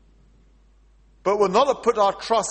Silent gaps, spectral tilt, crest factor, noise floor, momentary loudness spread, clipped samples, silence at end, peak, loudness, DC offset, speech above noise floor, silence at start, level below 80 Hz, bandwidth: none; -3.5 dB/octave; 16 dB; -55 dBFS; 6 LU; under 0.1%; 0 s; -6 dBFS; -21 LUFS; under 0.1%; 35 dB; 1.25 s; -54 dBFS; 8.8 kHz